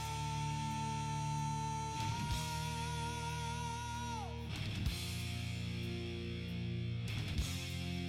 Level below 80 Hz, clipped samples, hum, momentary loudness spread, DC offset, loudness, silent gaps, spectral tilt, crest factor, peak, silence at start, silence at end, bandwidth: -50 dBFS; under 0.1%; none; 3 LU; under 0.1%; -40 LUFS; none; -4.5 dB/octave; 12 dB; -28 dBFS; 0 s; 0 s; 16.5 kHz